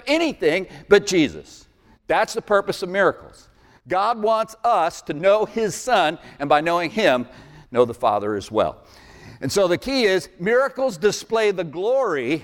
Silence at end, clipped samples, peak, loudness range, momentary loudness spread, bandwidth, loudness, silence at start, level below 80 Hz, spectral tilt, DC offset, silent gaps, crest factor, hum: 0 s; under 0.1%; -2 dBFS; 2 LU; 6 LU; 17 kHz; -21 LUFS; 0.05 s; -54 dBFS; -4 dB/octave; under 0.1%; none; 18 dB; none